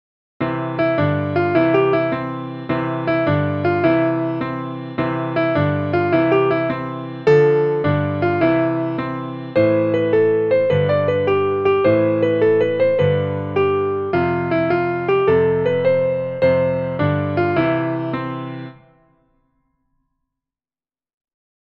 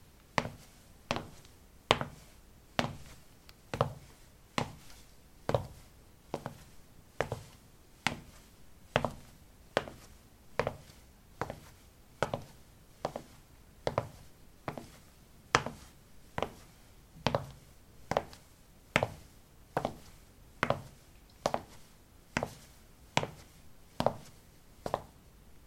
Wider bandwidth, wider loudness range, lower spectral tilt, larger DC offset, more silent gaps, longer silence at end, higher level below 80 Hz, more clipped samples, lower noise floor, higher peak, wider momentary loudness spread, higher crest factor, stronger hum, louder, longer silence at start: second, 5.8 kHz vs 16.5 kHz; about the same, 4 LU vs 4 LU; first, -9.5 dB/octave vs -4.5 dB/octave; neither; neither; first, 2.9 s vs 0.1 s; first, -52 dBFS vs -58 dBFS; neither; first, under -90 dBFS vs -59 dBFS; about the same, -2 dBFS vs -2 dBFS; second, 9 LU vs 24 LU; second, 16 dB vs 38 dB; neither; first, -18 LUFS vs -37 LUFS; about the same, 0.4 s vs 0.35 s